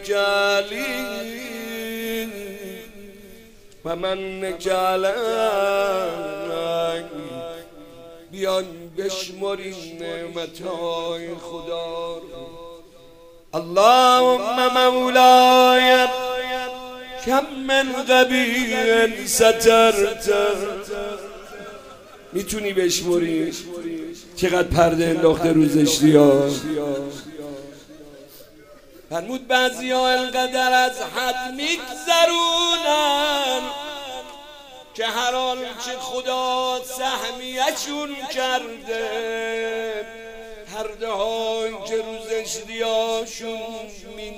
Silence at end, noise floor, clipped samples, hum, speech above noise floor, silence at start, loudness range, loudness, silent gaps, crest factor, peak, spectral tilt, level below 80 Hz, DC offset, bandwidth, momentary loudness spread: 0 s; -46 dBFS; under 0.1%; none; 26 dB; 0 s; 12 LU; -20 LUFS; none; 20 dB; 0 dBFS; -3.5 dB/octave; -48 dBFS; under 0.1%; 16 kHz; 20 LU